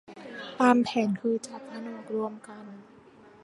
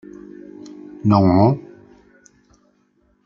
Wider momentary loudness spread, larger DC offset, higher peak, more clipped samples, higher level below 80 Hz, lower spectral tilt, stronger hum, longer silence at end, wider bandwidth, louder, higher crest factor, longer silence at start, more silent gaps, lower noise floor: second, 22 LU vs 25 LU; neither; second, -8 dBFS vs 0 dBFS; neither; second, -74 dBFS vs -56 dBFS; second, -5.5 dB/octave vs -9.5 dB/octave; neither; second, 0.6 s vs 1.65 s; first, 11 kHz vs 7.2 kHz; second, -27 LUFS vs -16 LUFS; about the same, 22 dB vs 20 dB; second, 0.1 s vs 0.65 s; neither; second, -54 dBFS vs -61 dBFS